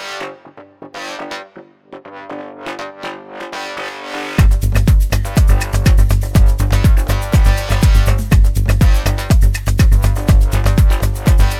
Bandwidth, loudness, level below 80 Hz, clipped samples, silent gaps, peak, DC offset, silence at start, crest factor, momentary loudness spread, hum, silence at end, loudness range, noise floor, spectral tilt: 15.5 kHz; -14 LUFS; -14 dBFS; under 0.1%; none; 0 dBFS; under 0.1%; 0 s; 12 dB; 15 LU; none; 0 s; 14 LU; -40 dBFS; -6 dB/octave